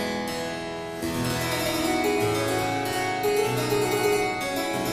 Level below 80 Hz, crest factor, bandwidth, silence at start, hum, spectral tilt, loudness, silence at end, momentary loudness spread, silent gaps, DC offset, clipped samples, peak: -50 dBFS; 14 dB; 15.5 kHz; 0 s; none; -4 dB/octave; -25 LUFS; 0 s; 7 LU; none; under 0.1%; under 0.1%; -12 dBFS